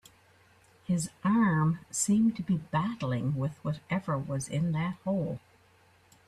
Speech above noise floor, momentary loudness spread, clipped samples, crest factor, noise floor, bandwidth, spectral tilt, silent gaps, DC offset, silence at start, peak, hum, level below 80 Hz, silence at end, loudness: 33 dB; 8 LU; under 0.1%; 16 dB; -62 dBFS; 13.5 kHz; -6 dB/octave; none; under 0.1%; 0.9 s; -16 dBFS; none; -62 dBFS; 0.9 s; -30 LUFS